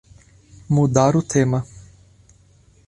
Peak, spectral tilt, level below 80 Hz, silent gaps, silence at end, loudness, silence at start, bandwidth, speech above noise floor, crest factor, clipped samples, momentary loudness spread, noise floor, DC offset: -2 dBFS; -6.5 dB/octave; -48 dBFS; none; 1.05 s; -19 LUFS; 0.7 s; 11 kHz; 36 dB; 18 dB; under 0.1%; 9 LU; -53 dBFS; under 0.1%